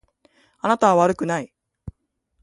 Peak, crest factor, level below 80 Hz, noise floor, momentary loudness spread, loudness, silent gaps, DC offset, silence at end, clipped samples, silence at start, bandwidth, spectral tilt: -2 dBFS; 20 dB; -52 dBFS; -71 dBFS; 25 LU; -20 LUFS; none; under 0.1%; 0.55 s; under 0.1%; 0.65 s; 11.5 kHz; -6 dB/octave